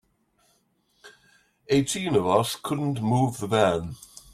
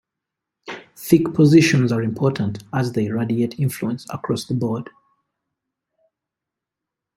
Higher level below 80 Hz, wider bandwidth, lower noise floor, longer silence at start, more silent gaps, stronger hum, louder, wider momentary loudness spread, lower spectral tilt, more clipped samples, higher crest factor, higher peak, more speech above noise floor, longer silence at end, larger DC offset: about the same, -58 dBFS vs -58 dBFS; about the same, 16 kHz vs 16.5 kHz; second, -68 dBFS vs -85 dBFS; first, 1.05 s vs 0.65 s; neither; neither; second, -24 LUFS vs -19 LUFS; second, 7 LU vs 18 LU; about the same, -5.5 dB/octave vs -6.5 dB/octave; neither; about the same, 20 dB vs 20 dB; second, -6 dBFS vs -2 dBFS; second, 44 dB vs 66 dB; second, 0.35 s vs 2.25 s; neither